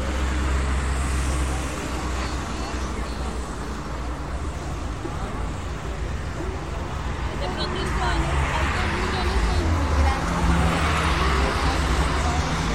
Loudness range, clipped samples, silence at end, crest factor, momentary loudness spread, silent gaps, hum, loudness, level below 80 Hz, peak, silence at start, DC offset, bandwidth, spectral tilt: 8 LU; under 0.1%; 0 s; 16 dB; 9 LU; none; none; -25 LUFS; -28 dBFS; -8 dBFS; 0 s; 0.9%; 13 kHz; -5 dB/octave